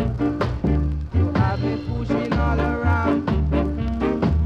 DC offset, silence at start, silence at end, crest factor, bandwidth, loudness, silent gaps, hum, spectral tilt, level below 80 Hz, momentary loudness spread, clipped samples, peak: under 0.1%; 0 s; 0 s; 12 dB; 6.8 kHz; -22 LUFS; none; none; -9 dB/octave; -26 dBFS; 4 LU; under 0.1%; -8 dBFS